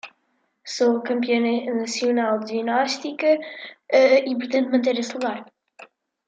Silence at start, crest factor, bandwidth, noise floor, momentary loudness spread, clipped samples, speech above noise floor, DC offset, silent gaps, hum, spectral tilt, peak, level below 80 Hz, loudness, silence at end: 0.05 s; 18 dB; 9.2 kHz; -70 dBFS; 11 LU; under 0.1%; 48 dB; under 0.1%; none; none; -3.5 dB/octave; -4 dBFS; -76 dBFS; -22 LUFS; 0.4 s